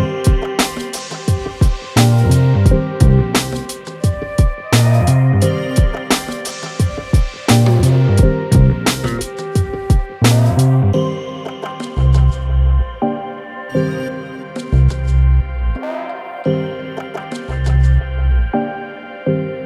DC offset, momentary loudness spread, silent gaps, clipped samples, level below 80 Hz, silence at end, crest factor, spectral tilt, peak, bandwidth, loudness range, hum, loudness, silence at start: under 0.1%; 13 LU; none; under 0.1%; -20 dBFS; 0 s; 14 dB; -6 dB/octave; 0 dBFS; 14.5 kHz; 4 LU; none; -16 LUFS; 0 s